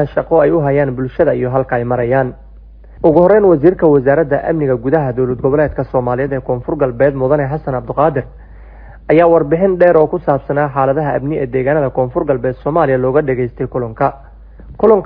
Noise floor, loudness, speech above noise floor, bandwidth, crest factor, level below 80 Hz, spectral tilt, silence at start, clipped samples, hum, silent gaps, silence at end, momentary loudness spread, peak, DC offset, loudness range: -36 dBFS; -14 LUFS; 24 dB; 5 kHz; 14 dB; -36 dBFS; -12 dB/octave; 0 s; 0.1%; none; none; 0 s; 8 LU; 0 dBFS; under 0.1%; 3 LU